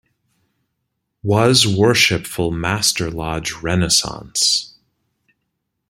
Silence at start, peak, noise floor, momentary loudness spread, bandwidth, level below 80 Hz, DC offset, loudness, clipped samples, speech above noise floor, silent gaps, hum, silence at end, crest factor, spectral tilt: 1.25 s; 0 dBFS; -75 dBFS; 11 LU; 16.5 kHz; -44 dBFS; under 0.1%; -16 LUFS; under 0.1%; 57 dB; none; none; 1.2 s; 20 dB; -3 dB/octave